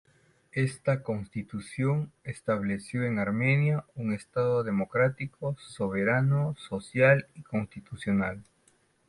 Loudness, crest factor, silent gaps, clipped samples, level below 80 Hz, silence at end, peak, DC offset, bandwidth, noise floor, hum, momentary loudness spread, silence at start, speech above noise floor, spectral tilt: -29 LUFS; 20 dB; none; under 0.1%; -60 dBFS; 0.65 s; -10 dBFS; under 0.1%; 11.5 kHz; -67 dBFS; none; 12 LU; 0.55 s; 38 dB; -7.5 dB/octave